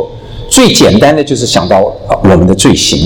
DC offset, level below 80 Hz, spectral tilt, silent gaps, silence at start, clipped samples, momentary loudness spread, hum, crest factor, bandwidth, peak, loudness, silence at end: under 0.1%; -28 dBFS; -4.5 dB/octave; none; 0 s; 4%; 7 LU; none; 8 dB; 19.5 kHz; 0 dBFS; -7 LUFS; 0 s